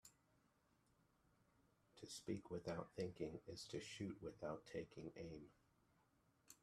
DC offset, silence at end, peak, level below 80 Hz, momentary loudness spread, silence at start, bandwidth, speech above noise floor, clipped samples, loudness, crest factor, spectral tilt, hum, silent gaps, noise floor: under 0.1%; 0.05 s; -32 dBFS; -78 dBFS; 12 LU; 0.05 s; 13.5 kHz; 29 dB; under 0.1%; -52 LUFS; 22 dB; -5 dB/octave; none; none; -81 dBFS